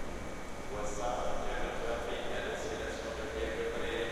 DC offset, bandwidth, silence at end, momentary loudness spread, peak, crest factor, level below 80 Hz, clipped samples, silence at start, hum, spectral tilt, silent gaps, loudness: under 0.1%; 14 kHz; 0 s; 6 LU; -22 dBFS; 14 dB; -44 dBFS; under 0.1%; 0 s; none; -4 dB/octave; none; -38 LUFS